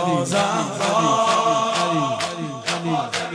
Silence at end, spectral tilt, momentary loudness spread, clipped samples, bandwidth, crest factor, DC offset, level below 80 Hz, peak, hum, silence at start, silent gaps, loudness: 0 s; -4 dB/octave; 7 LU; under 0.1%; 11 kHz; 14 dB; under 0.1%; -64 dBFS; -6 dBFS; none; 0 s; none; -20 LUFS